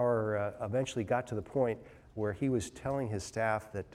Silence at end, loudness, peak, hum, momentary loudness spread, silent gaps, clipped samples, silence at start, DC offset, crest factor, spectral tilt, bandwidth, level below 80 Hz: 0 s; -34 LUFS; -16 dBFS; none; 5 LU; none; under 0.1%; 0 s; under 0.1%; 16 dB; -6 dB/octave; 13.5 kHz; -60 dBFS